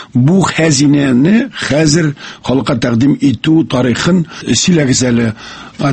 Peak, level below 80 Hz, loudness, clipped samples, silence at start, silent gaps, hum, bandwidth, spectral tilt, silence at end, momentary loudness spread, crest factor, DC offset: 0 dBFS; -40 dBFS; -11 LUFS; under 0.1%; 0 s; none; none; 8.8 kHz; -5 dB/octave; 0 s; 7 LU; 12 dB; under 0.1%